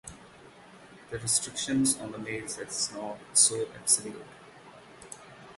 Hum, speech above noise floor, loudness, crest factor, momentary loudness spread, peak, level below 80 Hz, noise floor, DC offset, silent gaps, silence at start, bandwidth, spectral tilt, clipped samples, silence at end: none; 23 dB; -27 LUFS; 24 dB; 24 LU; -8 dBFS; -64 dBFS; -52 dBFS; under 0.1%; none; 0.05 s; 12 kHz; -2 dB/octave; under 0.1%; 0 s